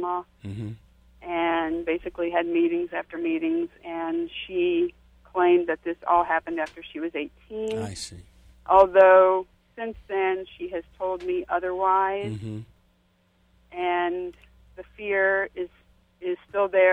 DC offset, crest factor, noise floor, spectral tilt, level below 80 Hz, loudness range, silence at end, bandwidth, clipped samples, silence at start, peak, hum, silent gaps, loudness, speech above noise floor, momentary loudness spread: under 0.1%; 20 dB; -65 dBFS; -6 dB/octave; -56 dBFS; 7 LU; 0 s; 11 kHz; under 0.1%; 0 s; -4 dBFS; none; none; -24 LUFS; 41 dB; 16 LU